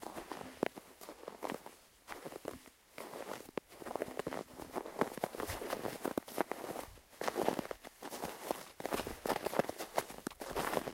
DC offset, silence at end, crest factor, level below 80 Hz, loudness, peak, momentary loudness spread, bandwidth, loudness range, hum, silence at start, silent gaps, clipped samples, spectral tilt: under 0.1%; 0 s; 30 dB; -64 dBFS; -42 LUFS; -12 dBFS; 13 LU; 16.5 kHz; 6 LU; none; 0 s; none; under 0.1%; -4 dB/octave